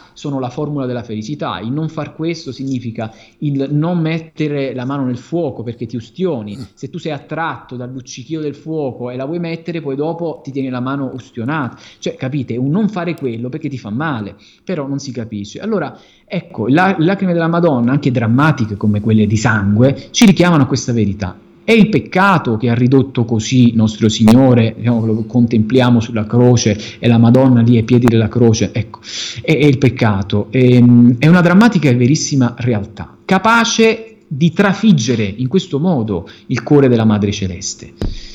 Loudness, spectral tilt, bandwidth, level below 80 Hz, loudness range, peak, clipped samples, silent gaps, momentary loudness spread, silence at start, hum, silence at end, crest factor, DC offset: -14 LUFS; -6.5 dB/octave; 10.5 kHz; -42 dBFS; 11 LU; 0 dBFS; under 0.1%; none; 15 LU; 0.15 s; none; 0 s; 14 dB; under 0.1%